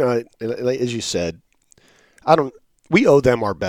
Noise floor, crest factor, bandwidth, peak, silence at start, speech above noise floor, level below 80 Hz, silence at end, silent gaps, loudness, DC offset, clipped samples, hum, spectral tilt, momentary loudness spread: -56 dBFS; 20 dB; 15.5 kHz; 0 dBFS; 0 s; 38 dB; -48 dBFS; 0 s; none; -19 LUFS; under 0.1%; under 0.1%; none; -5.5 dB/octave; 14 LU